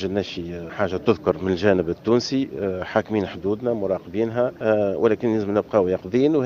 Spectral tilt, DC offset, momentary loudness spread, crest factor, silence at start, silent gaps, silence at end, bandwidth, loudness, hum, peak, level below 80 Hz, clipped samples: -7 dB/octave; under 0.1%; 6 LU; 18 dB; 0 s; none; 0 s; 12.5 kHz; -23 LUFS; none; -4 dBFS; -56 dBFS; under 0.1%